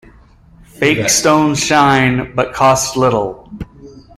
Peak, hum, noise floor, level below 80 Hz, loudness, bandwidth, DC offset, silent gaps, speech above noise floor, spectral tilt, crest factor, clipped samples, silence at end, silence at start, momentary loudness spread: 0 dBFS; none; -44 dBFS; -40 dBFS; -13 LUFS; 15.5 kHz; under 0.1%; none; 31 dB; -4 dB/octave; 14 dB; under 0.1%; 0.15 s; 0.8 s; 19 LU